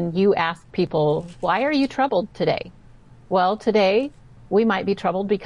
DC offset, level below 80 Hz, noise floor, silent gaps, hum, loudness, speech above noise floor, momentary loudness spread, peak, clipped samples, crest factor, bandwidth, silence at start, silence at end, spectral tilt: 0.2%; -52 dBFS; -48 dBFS; none; none; -21 LUFS; 27 dB; 6 LU; -8 dBFS; under 0.1%; 14 dB; 10.5 kHz; 0 s; 0 s; -7 dB/octave